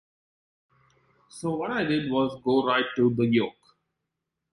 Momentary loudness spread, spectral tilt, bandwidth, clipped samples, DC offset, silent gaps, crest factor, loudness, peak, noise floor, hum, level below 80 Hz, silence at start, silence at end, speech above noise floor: 8 LU; -6.5 dB/octave; 11.5 kHz; under 0.1%; under 0.1%; none; 18 dB; -26 LUFS; -10 dBFS; -84 dBFS; none; -64 dBFS; 1.35 s; 1 s; 59 dB